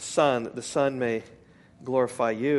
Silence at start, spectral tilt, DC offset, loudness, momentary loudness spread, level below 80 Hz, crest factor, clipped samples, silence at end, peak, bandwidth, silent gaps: 0 s; -5 dB/octave; under 0.1%; -27 LUFS; 7 LU; -66 dBFS; 18 dB; under 0.1%; 0 s; -8 dBFS; 11.5 kHz; none